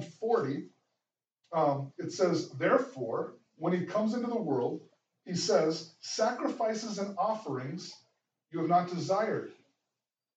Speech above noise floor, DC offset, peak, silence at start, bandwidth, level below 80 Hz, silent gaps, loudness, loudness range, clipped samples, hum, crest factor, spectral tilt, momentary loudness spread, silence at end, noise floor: 59 dB; under 0.1%; -12 dBFS; 0 s; 9 kHz; -90 dBFS; none; -32 LUFS; 2 LU; under 0.1%; none; 20 dB; -5.5 dB/octave; 11 LU; 0.85 s; -90 dBFS